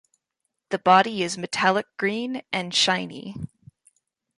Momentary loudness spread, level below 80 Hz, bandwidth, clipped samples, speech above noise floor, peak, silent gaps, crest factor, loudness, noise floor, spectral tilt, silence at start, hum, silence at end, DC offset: 18 LU; -62 dBFS; 11.5 kHz; under 0.1%; 57 dB; -4 dBFS; none; 20 dB; -22 LUFS; -80 dBFS; -3 dB/octave; 0.7 s; none; 0.9 s; under 0.1%